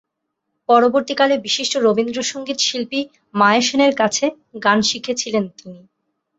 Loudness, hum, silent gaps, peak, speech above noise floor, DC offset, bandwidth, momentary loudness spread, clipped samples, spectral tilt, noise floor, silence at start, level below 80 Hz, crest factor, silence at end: -17 LUFS; none; none; -2 dBFS; 59 dB; under 0.1%; 8.2 kHz; 9 LU; under 0.1%; -3 dB/octave; -76 dBFS; 0.7 s; -62 dBFS; 16 dB; 0.6 s